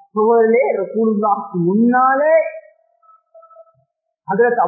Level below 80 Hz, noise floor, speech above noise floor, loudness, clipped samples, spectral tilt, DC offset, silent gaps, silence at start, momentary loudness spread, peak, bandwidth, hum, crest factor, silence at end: -76 dBFS; -65 dBFS; 51 dB; -15 LUFS; under 0.1%; -16 dB/octave; under 0.1%; none; 0.15 s; 7 LU; -2 dBFS; 2.6 kHz; none; 14 dB; 0 s